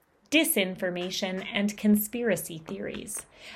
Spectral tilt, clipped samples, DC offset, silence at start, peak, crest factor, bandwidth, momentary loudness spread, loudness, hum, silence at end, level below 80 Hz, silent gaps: -3.5 dB/octave; under 0.1%; under 0.1%; 0.3 s; -10 dBFS; 18 dB; 16 kHz; 13 LU; -28 LUFS; none; 0 s; -64 dBFS; none